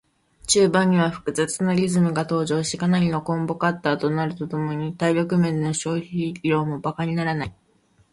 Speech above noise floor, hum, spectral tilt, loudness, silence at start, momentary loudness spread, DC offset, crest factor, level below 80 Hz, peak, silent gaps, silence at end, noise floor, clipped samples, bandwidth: 39 dB; none; -5.5 dB/octave; -22 LUFS; 0.45 s; 8 LU; under 0.1%; 18 dB; -54 dBFS; -6 dBFS; none; 0.6 s; -61 dBFS; under 0.1%; 11.5 kHz